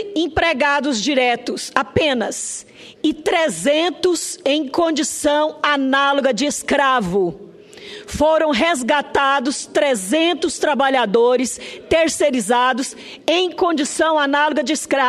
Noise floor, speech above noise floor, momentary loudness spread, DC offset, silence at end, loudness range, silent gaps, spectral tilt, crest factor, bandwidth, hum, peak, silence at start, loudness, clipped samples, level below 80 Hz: -38 dBFS; 21 dB; 7 LU; under 0.1%; 0 s; 2 LU; none; -3 dB/octave; 18 dB; 13.5 kHz; none; 0 dBFS; 0 s; -18 LUFS; under 0.1%; -48 dBFS